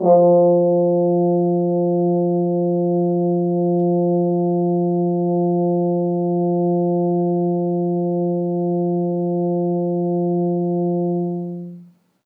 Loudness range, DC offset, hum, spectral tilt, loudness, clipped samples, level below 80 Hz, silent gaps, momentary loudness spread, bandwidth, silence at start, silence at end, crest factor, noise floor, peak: 3 LU; under 0.1%; none; -15 dB/octave; -19 LUFS; under 0.1%; -90 dBFS; none; 4 LU; 1.3 kHz; 0 s; 0.4 s; 14 dB; -45 dBFS; -4 dBFS